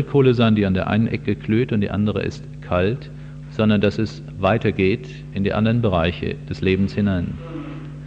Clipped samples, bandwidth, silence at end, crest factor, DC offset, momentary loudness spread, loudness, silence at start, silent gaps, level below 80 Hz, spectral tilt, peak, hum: under 0.1%; 7.6 kHz; 0 s; 16 dB; under 0.1%; 14 LU; -20 LUFS; 0 s; none; -42 dBFS; -8.5 dB/octave; -4 dBFS; none